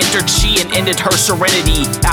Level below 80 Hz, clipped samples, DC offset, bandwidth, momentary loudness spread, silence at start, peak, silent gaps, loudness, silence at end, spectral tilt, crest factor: -22 dBFS; under 0.1%; under 0.1%; over 20 kHz; 3 LU; 0 s; 0 dBFS; none; -12 LUFS; 0 s; -2.5 dB/octave; 12 dB